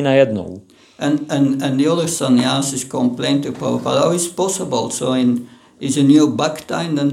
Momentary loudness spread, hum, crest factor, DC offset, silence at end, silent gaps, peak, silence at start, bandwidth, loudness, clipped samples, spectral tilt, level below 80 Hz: 9 LU; none; 16 dB; under 0.1%; 0 s; none; 0 dBFS; 0 s; 15.5 kHz; -17 LUFS; under 0.1%; -5 dB/octave; -62 dBFS